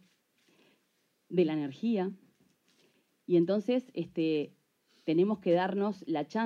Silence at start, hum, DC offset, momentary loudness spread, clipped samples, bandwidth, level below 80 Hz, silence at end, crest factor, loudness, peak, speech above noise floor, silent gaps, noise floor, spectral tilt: 1.3 s; none; under 0.1%; 10 LU; under 0.1%; 7 kHz; -82 dBFS; 0 s; 18 dB; -31 LUFS; -16 dBFS; 46 dB; none; -75 dBFS; -8 dB/octave